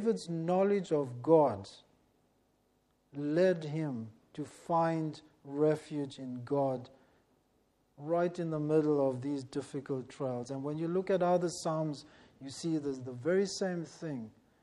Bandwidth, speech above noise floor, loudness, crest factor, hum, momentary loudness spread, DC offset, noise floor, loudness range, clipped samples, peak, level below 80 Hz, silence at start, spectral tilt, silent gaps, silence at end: 12 kHz; 41 dB; -33 LUFS; 20 dB; none; 15 LU; under 0.1%; -74 dBFS; 3 LU; under 0.1%; -14 dBFS; -76 dBFS; 0 s; -6.5 dB/octave; none; 0.35 s